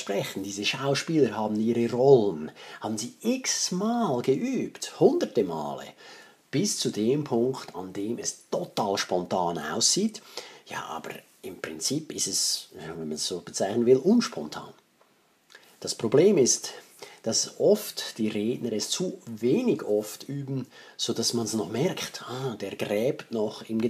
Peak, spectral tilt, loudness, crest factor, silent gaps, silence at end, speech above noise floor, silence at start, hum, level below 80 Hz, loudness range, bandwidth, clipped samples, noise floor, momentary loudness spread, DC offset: -6 dBFS; -4 dB/octave; -27 LUFS; 22 dB; none; 0 s; 37 dB; 0 s; none; -72 dBFS; 4 LU; 15.5 kHz; under 0.1%; -64 dBFS; 15 LU; under 0.1%